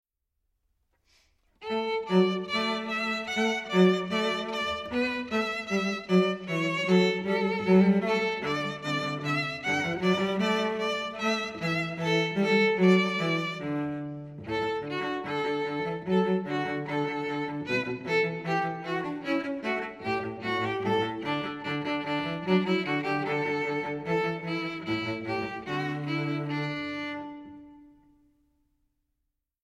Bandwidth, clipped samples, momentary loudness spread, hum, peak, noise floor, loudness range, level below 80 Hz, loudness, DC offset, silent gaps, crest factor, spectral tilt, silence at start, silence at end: 12 kHz; under 0.1%; 9 LU; none; -10 dBFS; -82 dBFS; 5 LU; -64 dBFS; -28 LUFS; under 0.1%; none; 20 dB; -6 dB/octave; 1.6 s; 1.8 s